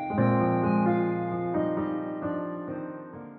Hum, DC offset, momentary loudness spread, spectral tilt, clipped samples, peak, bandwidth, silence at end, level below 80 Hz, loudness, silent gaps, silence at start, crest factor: none; under 0.1%; 12 LU; -8.5 dB/octave; under 0.1%; -12 dBFS; 4.4 kHz; 0 s; -60 dBFS; -28 LUFS; none; 0 s; 14 dB